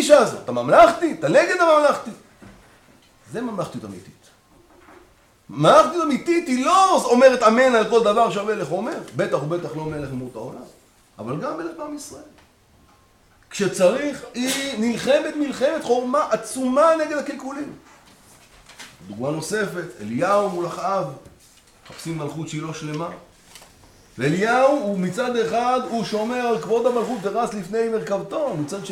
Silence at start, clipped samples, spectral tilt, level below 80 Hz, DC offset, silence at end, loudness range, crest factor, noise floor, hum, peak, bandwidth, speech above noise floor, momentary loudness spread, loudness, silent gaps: 0 s; under 0.1%; -4.5 dB/octave; -58 dBFS; under 0.1%; 0 s; 13 LU; 20 dB; -55 dBFS; none; 0 dBFS; 16.5 kHz; 35 dB; 18 LU; -20 LUFS; none